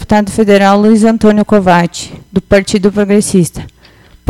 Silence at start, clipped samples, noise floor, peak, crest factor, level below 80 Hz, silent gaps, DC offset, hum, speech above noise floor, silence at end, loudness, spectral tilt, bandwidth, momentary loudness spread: 0 s; 2%; -41 dBFS; 0 dBFS; 10 dB; -34 dBFS; none; under 0.1%; none; 32 dB; 0.6 s; -9 LUFS; -6 dB/octave; 14 kHz; 11 LU